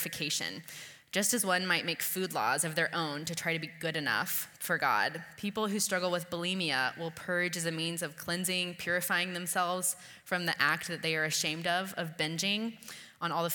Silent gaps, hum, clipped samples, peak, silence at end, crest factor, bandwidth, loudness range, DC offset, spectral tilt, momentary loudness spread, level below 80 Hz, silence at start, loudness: none; none; under 0.1%; -10 dBFS; 0 s; 22 dB; 19 kHz; 1 LU; under 0.1%; -2.5 dB/octave; 8 LU; -76 dBFS; 0 s; -32 LUFS